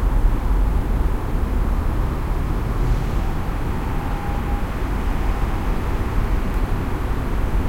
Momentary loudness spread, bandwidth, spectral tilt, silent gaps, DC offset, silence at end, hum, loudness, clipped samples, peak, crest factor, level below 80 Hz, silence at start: 3 LU; 16 kHz; -7.5 dB/octave; none; under 0.1%; 0 s; none; -24 LUFS; under 0.1%; -6 dBFS; 14 dB; -20 dBFS; 0 s